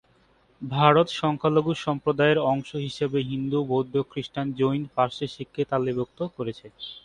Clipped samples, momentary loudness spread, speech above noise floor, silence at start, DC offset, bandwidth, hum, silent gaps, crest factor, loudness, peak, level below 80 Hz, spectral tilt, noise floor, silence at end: under 0.1%; 12 LU; 37 dB; 0.6 s; under 0.1%; 10.5 kHz; none; none; 22 dB; -25 LUFS; -4 dBFS; -60 dBFS; -7 dB/octave; -61 dBFS; 0.05 s